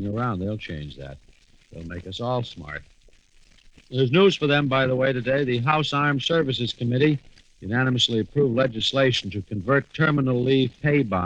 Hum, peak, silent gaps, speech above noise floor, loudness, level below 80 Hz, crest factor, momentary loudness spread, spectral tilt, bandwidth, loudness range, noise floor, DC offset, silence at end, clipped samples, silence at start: none; -6 dBFS; none; 32 dB; -22 LUFS; -52 dBFS; 18 dB; 15 LU; -6 dB/octave; 8.8 kHz; 10 LU; -55 dBFS; under 0.1%; 0 s; under 0.1%; 0 s